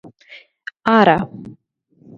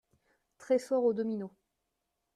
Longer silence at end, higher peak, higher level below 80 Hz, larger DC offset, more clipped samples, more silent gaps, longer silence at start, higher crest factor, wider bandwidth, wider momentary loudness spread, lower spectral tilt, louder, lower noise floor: second, 0.65 s vs 0.85 s; first, 0 dBFS vs -18 dBFS; first, -54 dBFS vs -80 dBFS; neither; neither; neither; second, 0.3 s vs 0.6 s; about the same, 20 dB vs 18 dB; second, 7.2 kHz vs 13 kHz; first, 23 LU vs 11 LU; about the same, -7.5 dB/octave vs -6.5 dB/octave; first, -15 LUFS vs -32 LUFS; second, -55 dBFS vs -84 dBFS